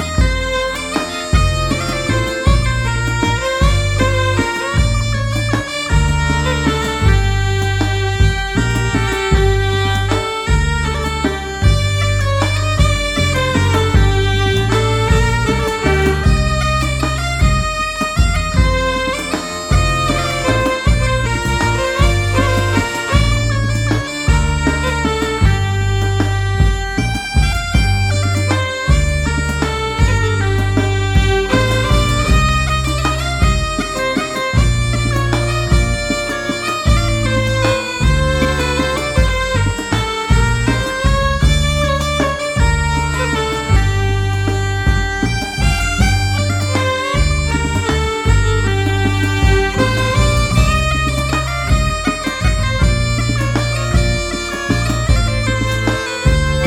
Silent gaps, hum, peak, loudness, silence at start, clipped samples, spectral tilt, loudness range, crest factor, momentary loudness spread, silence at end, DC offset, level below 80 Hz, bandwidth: none; none; -2 dBFS; -16 LUFS; 0 s; under 0.1%; -5 dB/octave; 2 LU; 12 dB; 4 LU; 0 s; under 0.1%; -20 dBFS; 15 kHz